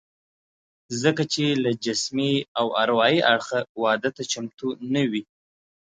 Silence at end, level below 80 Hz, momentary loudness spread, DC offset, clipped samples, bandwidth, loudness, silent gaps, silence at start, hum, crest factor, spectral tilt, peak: 0.65 s; -70 dBFS; 10 LU; under 0.1%; under 0.1%; 9.4 kHz; -23 LUFS; 2.48-2.55 s, 3.69-3.75 s; 0.9 s; none; 20 dB; -4 dB/octave; -4 dBFS